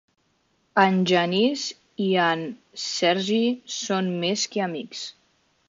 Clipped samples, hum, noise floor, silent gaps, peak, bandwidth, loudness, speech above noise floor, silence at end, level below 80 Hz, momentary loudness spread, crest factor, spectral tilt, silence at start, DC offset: under 0.1%; none; -68 dBFS; none; -4 dBFS; 7.6 kHz; -23 LUFS; 45 dB; 0.55 s; -74 dBFS; 12 LU; 20 dB; -4 dB/octave; 0.75 s; under 0.1%